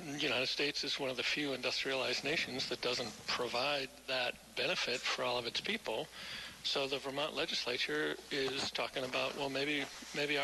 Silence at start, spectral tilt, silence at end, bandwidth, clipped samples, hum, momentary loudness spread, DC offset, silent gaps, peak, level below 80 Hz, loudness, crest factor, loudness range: 0 s; -2.5 dB/octave; 0 s; 12.5 kHz; under 0.1%; none; 4 LU; under 0.1%; none; -22 dBFS; -70 dBFS; -36 LUFS; 16 dB; 2 LU